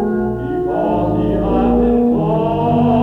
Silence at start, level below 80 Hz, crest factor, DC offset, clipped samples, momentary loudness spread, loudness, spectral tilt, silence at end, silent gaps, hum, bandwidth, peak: 0 s; -30 dBFS; 12 dB; under 0.1%; under 0.1%; 5 LU; -16 LUFS; -10 dB/octave; 0 s; none; none; 4.2 kHz; -2 dBFS